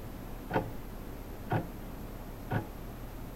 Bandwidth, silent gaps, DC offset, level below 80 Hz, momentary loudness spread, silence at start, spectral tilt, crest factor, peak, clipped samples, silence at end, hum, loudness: 16 kHz; none; 0.1%; -46 dBFS; 10 LU; 0 s; -7 dB/octave; 20 dB; -18 dBFS; under 0.1%; 0 s; none; -39 LUFS